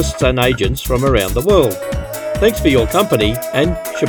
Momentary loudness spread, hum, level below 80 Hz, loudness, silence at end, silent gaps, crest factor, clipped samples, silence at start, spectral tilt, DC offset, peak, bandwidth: 7 LU; none; -26 dBFS; -15 LUFS; 0 s; none; 14 dB; under 0.1%; 0 s; -5 dB/octave; under 0.1%; 0 dBFS; 19.5 kHz